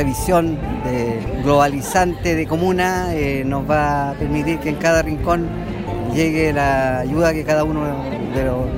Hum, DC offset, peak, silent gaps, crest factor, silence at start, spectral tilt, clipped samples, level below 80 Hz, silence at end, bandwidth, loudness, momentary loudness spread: none; under 0.1%; -4 dBFS; none; 16 dB; 0 s; -6 dB/octave; under 0.1%; -32 dBFS; 0 s; 16 kHz; -19 LUFS; 6 LU